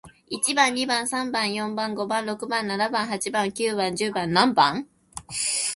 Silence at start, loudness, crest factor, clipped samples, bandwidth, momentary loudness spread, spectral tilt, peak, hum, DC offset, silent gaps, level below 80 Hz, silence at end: 0.05 s; -24 LUFS; 22 dB; under 0.1%; 12 kHz; 8 LU; -2.5 dB/octave; -4 dBFS; none; under 0.1%; none; -62 dBFS; 0 s